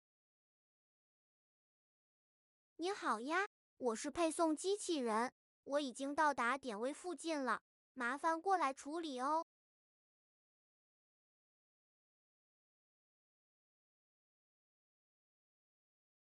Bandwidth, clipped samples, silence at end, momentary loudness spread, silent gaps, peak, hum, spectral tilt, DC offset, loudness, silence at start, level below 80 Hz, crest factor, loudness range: 11.5 kHz; under 0.1%; 6.8 s; 8 LU; 3.46-3.77 s, 5.32-5.63 s, 7.61-7.95 s; -24 dBFS; none; -2.5 dB/octave; under 0.1%; -40 LUFS; 2.8 s; -84 dBFS; 20 dB; 8 LU